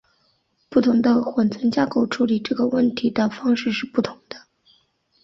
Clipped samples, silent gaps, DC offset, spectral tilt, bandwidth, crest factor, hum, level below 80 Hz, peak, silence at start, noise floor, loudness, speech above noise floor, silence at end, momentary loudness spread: under 0.1%; none; under 0.1%; -6.5 dB/octave; 7.4 kHz; 16 dB; none; -60 dBFS; -6 dBFS; 0.7 s; -66 dBFS; -21 LUFS; 46 dB; 0.85 s; 8 LU